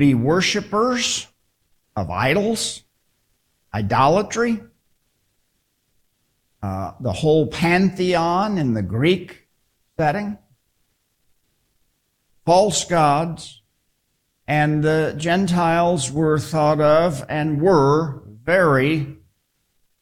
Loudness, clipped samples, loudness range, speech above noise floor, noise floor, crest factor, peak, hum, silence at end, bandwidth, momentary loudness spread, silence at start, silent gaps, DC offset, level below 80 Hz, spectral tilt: -19 LUFS; under 0.1%; 7 LU; 52 dB; -70 dBFS; 16 dB; -4 dBFS; none; 0.85 s; 15.5 kHz; 14 LU; 0 s; none; under 0.1%; -50 dBFS; -5 dB/octave